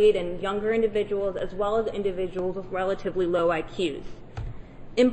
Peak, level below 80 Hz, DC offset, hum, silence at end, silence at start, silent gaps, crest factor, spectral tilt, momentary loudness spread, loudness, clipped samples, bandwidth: -10 dBFS; -44 dBFS; under 0.1%; none; 0 s; 0 s; none; 16 dB; -6.5 dB/octave; 15 LU; -27 LUFS; under 0.1%; 8.6 kHz